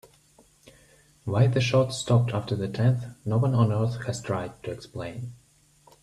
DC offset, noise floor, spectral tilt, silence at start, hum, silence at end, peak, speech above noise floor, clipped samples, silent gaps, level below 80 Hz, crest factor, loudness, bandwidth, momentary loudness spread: under 0.1%; -59 dBFS; -6.5 dB/octave; 1.25 s; none; 0.7 s; -8 dBFS; 34 dB; under 0.1%; none; -58 dBFS; 18 dB; -26 LUFS; 11 kHz; 14 LU